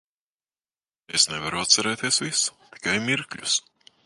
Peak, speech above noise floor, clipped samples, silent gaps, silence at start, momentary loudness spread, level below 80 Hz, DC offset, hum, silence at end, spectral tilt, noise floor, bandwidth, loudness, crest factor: -4 dBFS; over 65 dB; under 0.1%; none; 1.1 s; 8 LU; -62 dBFS; under 0.1%; none; 0.45 s; -1 dB/octave; under -90 dBFS; 12 kHz; -23 LUFS; 24 dB